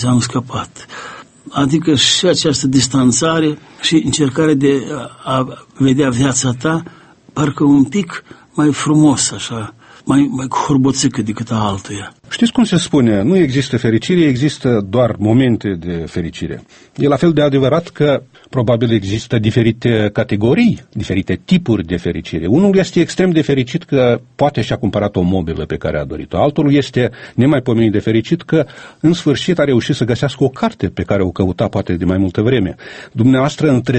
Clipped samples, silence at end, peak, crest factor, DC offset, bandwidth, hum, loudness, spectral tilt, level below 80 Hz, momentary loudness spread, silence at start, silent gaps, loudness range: under 0.1%; 0 s; 0 dBFS; 14 dB; under 0.1%; 8.8 kHz; none; -15 LUFS; -5.5 dB/octave; -42 dBFS; 11 LU; 0 s; none; 2 LU